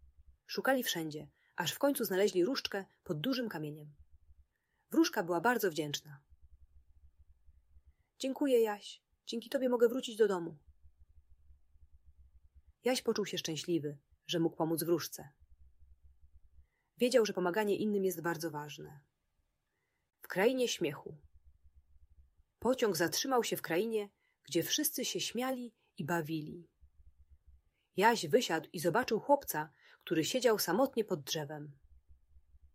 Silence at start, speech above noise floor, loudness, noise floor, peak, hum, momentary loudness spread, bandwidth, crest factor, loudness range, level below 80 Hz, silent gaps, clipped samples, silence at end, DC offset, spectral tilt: 0.5 s; 49 dB; -34 LUFS; -83 dBFS; -14 dBFS; none; 15 LU; 16 kHz; 22 dB; 5 LU; -68 dBFS; none; under 0.1%; 1.05 s; under 0.1%; -4 dB/octave